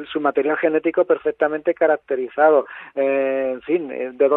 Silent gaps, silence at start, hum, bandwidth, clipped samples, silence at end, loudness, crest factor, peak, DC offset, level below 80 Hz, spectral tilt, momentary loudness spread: none; 0 s; none; 4 kHz; under 0.1%; 0 s; -20 LUFS; 16 dB; -2 dBFS; under 0.1%; -66 dBFS; -9 dB/octave; 7 LU